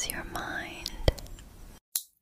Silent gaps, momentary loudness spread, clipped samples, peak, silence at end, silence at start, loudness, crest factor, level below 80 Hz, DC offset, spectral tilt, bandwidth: 1.81-1.92 s; 20 LU; under 0.1%; -6 dBFS; 0.15 s; 0 s; -34 LUFS; 28 dB; -40 dBFS; under 0.1%; -3 dB/octave; 16 kHz